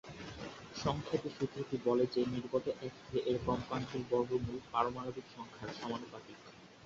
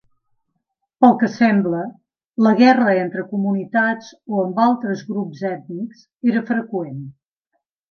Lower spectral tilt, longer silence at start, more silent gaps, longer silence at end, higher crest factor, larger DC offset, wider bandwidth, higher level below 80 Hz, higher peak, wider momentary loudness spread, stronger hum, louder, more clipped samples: second, -5.5 dB/octave vs -7.5 dB/octave; second, 0.05 s vs 1 s; second, none vs 2.27-2.31 s, 6.15-6.19 s; second, 0 s vs 0.8 s; about the same, 22 dB vs 18 dB; neither; first, 7.6 kHz vs 6.6 kHz; first, -60 dBFS vs -70 dBFS; second, -16 dBFS vs 0 dBFS; second, 14 LU vs 17 LU; neither; second, -38 LUFS vs -18 LUFS; neither